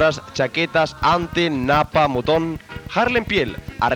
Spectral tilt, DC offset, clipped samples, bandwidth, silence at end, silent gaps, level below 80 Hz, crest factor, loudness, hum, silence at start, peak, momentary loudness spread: -5.5 dB/octave; under 0.1%; under 0.1%; 17 kHz; 0 s; none; -42 dBFS; 16 dB; -19 LUFS; none; 0 s; -4 dBFS; 7 LU